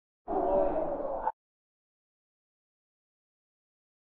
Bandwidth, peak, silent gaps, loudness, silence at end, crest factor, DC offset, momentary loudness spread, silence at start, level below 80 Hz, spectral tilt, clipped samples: 4.1 kHz; -16 dBFS; none; -32 LUFS; 2.75 s; 20 dB; under 0.1%; 8 LU; 0.25 s; -52 dBFS; -7.5 dB/octave; under 0.1%